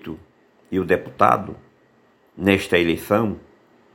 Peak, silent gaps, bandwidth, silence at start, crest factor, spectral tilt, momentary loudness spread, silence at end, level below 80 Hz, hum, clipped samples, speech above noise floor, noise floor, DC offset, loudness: 0 dBFS; none; 17 kHz; 0.05 s; 22 dB; -6 dB/octave; 19 LU; 0.55 s; -52 dBFS; none; under 0.1%; 38 dB; -58 dBFS; under 0.1%; -20 LUFS